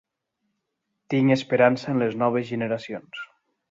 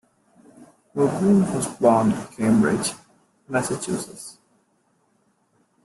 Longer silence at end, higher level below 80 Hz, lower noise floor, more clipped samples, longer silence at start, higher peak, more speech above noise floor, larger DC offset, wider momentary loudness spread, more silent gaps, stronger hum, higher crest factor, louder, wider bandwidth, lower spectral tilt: second, 0.45 s vs 1.55 s; second, -68 dBFS vs -60 dBFS; first, -79 dBFS vs -66 dBFS; neither; first, 1.1 s vs 0.6 s; about the same, -4 dBFS vs -4 dBFS; first, 56 dB vs 45 dB; neither; about the same, 17 LU vs 17 LU; neither; neither; about the same, 20 dB vs 20 dB; about the same, -23 LUFS vs -22 LUFS; second, 7.6 kHz vs 12.5 kHz; about the same, -7 dB/octave vs -6 dB/octave